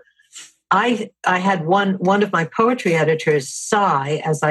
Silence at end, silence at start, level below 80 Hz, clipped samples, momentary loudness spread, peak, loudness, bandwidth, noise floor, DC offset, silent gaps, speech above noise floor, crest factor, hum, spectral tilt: 0 s; 0.35 s; -68 dBFS; under 0.1%; 4 LU; 0 dBFS; -18 LUFS; 12.5 kHz; -43 dBFS; under 0.1%; none; 25 dB; 18 dB; none; -5 dB/octave